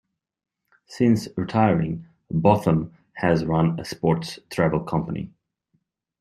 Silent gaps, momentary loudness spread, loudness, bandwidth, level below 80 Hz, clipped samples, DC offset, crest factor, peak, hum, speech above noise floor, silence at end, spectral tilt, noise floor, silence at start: none; 11 LU; -23 LUFS; 13 kHz; -52 dBFS; under 0.1%; under 0.1%; 20 dB; -2 dBFS; none; 50 dB; 0.9 s; -7.5 dB/octave; -71 dBFS; 0.9 s